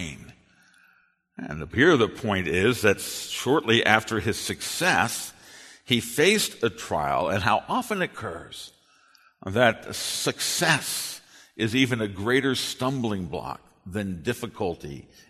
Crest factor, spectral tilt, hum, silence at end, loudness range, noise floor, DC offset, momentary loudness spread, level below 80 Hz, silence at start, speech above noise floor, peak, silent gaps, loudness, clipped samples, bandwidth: 26 dB; -3.5 dB/octave; none; 0.3 s; 4 LU; -64 dBFS; under 0.1%; 17 LU; -54 dBFS; 0 s; 39 dB; 0 dBFS; none; -24 LUFS; under 0.1%; 13.5 kHz